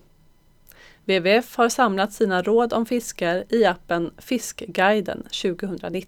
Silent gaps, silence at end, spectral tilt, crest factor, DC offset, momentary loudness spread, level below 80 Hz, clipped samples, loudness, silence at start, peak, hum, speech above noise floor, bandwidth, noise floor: none; 0.05 s; -4 dB/octave; 18 dB; under 0.1%; 8 LU; -54 dBFS; under 0.1%; -22 LUFS; 1.05 s; -4 dBFS; none; 34 dB; 19 kHz; -55 dBFS